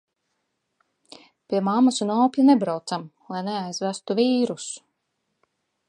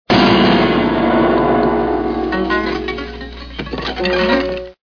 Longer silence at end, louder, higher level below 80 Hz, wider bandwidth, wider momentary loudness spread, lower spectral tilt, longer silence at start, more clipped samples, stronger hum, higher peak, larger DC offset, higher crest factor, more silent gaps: first, 1.1 s vs 0.1 s; second, -23 LUFS vs -15 LUFS; second, -80 dBFS vs -34 dBFS; first, 10.5 kHz vs 5.4 kHz; about the same, 14 LU vs 14 LU; second, -5 dB/octave vs -7 dB/octave; first, 1.5 s vs 0.1 s; neither; second, none vs 60 Hz at -35 dBFS; second, -6 dBFS vs 0 dBFS; second, under 0.1% vs 0.4%; about the same, 18 dB vs 14 dB; neither